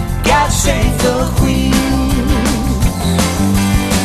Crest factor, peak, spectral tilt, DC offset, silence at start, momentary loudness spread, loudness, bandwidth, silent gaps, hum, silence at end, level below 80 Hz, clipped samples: 12 dB; 0 dBFS; -5 dB/octave; under 0.1%; 0 s; 3 LU; -14 LUFS; 14 kHz; none; none; 0 s; -18 dBFS; under 0.1%